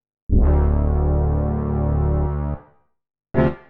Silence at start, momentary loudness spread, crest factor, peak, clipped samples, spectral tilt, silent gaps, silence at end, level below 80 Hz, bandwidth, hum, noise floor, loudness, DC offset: 0.3 s; 8 LU; 16 dB; -4 dBFS; under 0.1%; -12.5 dB/octave; none; 0.1 s; -22 dBFS; 3.5 kHz; none; -51 dBFS; -21 LUFS; under 0.1%